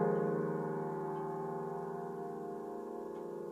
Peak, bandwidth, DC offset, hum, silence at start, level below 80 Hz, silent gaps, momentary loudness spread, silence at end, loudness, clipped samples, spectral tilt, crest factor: -22 dBFS; 14 kHz; under 0.1%; none; 0 s; -76 dBFS; none; 9 LU; 0 s; -40 LUFS; under 0.1%; -9 dB/octave; 16 dB